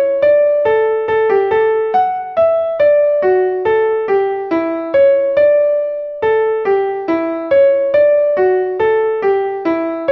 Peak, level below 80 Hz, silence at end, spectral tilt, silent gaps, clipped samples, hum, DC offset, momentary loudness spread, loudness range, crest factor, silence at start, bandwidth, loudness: -2 dBFS; -54 dBFS; 0 s; -7.5 dB/octave; none; under 0.1%; none; under 0.1%; 6 LU; 1 LU; 10 dB; 0 s; 5.4 kHz; -14 LUFS